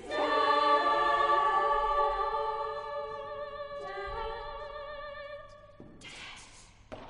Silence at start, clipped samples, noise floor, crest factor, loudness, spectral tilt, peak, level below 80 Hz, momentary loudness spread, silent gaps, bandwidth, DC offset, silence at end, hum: 0 s; under 0.1%; -54 dBFS; 16 dB; -30 LUFS; -3.5 dB/octave; -14 dBFS; -52 dBFS; 20 LU; none; 10.5 kHz; under 0.1%; 0 s; none